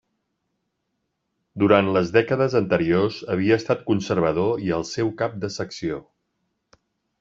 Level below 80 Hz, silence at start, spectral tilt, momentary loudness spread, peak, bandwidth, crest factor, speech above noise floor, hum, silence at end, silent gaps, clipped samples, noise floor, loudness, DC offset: -56 dBFS; 1.55 s; -6.5 dB/octave; 11 LU; -2 dBFS; 7.8 kHz; 20 dB; 55 dB; none; 1.2 s; none; under 0.1%; -76 dBFS; -22 LUFS; under 0.1%